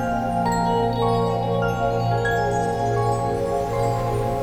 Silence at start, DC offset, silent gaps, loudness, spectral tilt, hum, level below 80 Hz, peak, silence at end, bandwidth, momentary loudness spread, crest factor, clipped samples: 0 s; under 0.1%; none; -22 LUFS; -6.5 dB/octave; none; -38 dBFS; -8 dBFS; 0 s; 15 kHz; 2 LU; 12 dB; under 0.1%